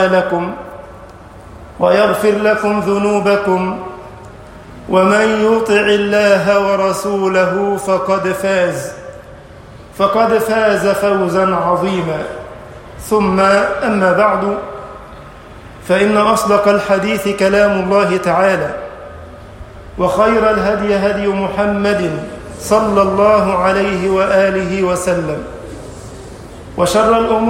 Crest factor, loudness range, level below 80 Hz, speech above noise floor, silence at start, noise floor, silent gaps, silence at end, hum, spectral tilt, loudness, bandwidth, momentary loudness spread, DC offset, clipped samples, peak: 14 dB; 3 LU; -40 dBFS; 23 dB; 0 s; -36 dBFS; none; 0 s; none; -5.5 dB/octave; -13 LUFS; 16.5 kHz; 20 LU; under 0.1%; under 0.1%; 0 dBFS